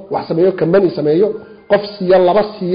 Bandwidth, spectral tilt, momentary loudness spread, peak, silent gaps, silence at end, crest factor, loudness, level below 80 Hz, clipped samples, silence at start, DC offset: 5.2 kHz; -12.5 dB/octave; 7 LU; -4 dBFS; none; 0 s; 10 dB; -14 LUFS; -52 dBFS; under 0.1%; 0 s; under 0.1%